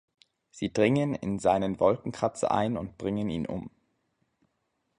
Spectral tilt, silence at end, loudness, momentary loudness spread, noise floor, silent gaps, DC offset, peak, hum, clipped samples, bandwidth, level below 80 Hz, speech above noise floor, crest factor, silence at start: -6.5 dB/octave; 1.3 s; -28 LUFS; 10 LU; -78 dBFS; none; under 0.1%; -10 dBFS; none; under 0.1%; 10.5 kHz; -56 dBFS; 50 dB; 20 dB; 0.55 s